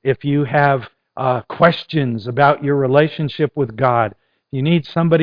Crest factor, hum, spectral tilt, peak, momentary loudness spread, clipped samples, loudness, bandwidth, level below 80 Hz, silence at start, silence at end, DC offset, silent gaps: 16 dB; none; -9.5 dB/octave; 0 dBFS; 8 LU; under 0.1%; -17 LUFS; 5.2 kHz; -52 dBFS; 0.05 s; 0 s; under 0.1%; none